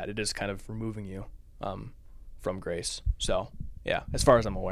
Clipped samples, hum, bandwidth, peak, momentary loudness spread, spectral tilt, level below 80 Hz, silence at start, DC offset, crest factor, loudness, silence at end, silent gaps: under 0.1%; none; 16 kHz; -8 dBFS; 19 LU; -4.5 dB/octave; -40 dBFS; 0 s; under 0.1%; 22 dB; -30 LUFS; 0 s; none